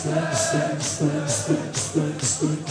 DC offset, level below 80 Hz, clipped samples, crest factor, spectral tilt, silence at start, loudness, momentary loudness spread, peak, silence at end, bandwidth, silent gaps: under 0.1%; -58 dBFS; under 0.1%; 14 dB; -4 dB/octave; 0 s; -23 LUFS; 3 LU; -8 dBFS; 0 s; 11 kHz; none